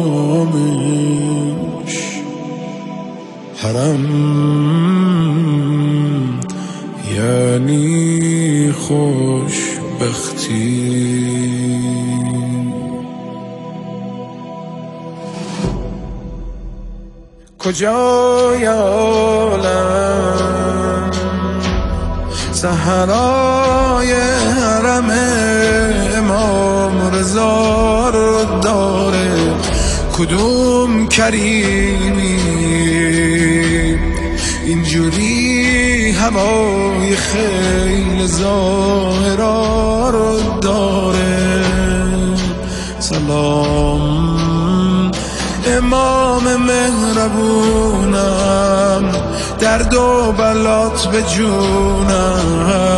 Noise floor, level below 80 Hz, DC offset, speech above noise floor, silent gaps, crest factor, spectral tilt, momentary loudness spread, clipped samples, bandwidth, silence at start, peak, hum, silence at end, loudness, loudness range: -39 dBFS; -26 dBFS; under 0.1%; 26 dB; none; 14 dB; -5 dB/octave; 11 LU; under 0.1%; 12.5 kHz; 0 s; 0 dBFS; none; 0 s; -14 LUFS; 6 LU